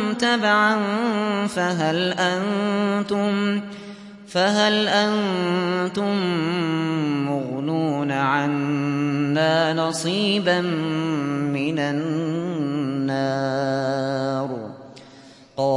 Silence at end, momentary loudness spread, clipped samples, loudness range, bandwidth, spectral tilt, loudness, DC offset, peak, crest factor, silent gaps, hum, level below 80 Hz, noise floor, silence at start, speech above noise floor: 0 s; 7 LU; under 0.1%; 3 LU; 11.5 kHz; -5.5 dB/octave; -22 LUFS; under 0.1%; -6 dBFS; 16 dB; none; none; -68 dBFS; -46 dBFS; 0 s; 25 dB